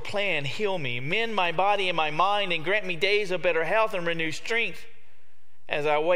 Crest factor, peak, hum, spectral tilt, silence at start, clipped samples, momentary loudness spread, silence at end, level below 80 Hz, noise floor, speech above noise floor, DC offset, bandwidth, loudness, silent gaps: 18 dB; -8 dBFS; none; -4 dB/octave; 0 s; under 0.1%; 5 LU; 0 s; -64 dBFS; -66 dBFS; 40 dB; 3%; 15.5 kHz; -26 LUFS; none